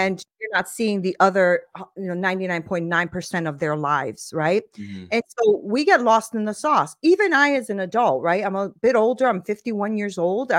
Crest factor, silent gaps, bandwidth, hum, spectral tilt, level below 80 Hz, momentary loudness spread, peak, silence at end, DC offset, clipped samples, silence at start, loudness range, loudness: 18 dB; none; 16 kHz; none; -5 dB/octave; -64 dBFS; 9 LU; -2 dBFS; 0 s; under 0.1%; under 0.1%; 0 s; 5 LU; -21 LUFS